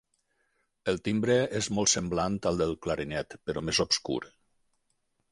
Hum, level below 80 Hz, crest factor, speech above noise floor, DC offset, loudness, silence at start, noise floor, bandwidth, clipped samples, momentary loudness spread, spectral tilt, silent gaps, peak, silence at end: none; -54 dBFS; 20 dB; 47 dB; under 0.1%; -29 LUFS; 0.85 s; -76 dBFS; 11.5 kHz; under 0.1%; 10 LU; -3.5 dB/octave; none; -10 dBFS; 1.05 s